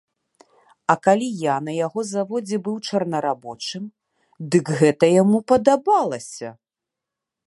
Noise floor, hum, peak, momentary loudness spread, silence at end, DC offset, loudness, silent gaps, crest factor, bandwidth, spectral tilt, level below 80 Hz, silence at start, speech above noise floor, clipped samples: -86 dBFS; none; -2 dBFS; 15 LU; 0.95 s; under 0.1%; -20 LUFS; none; 20 dB; 11.5 kHz; -6 dB/octave; -64 dBFS; 0.9 s; 66 dB; under 0.1%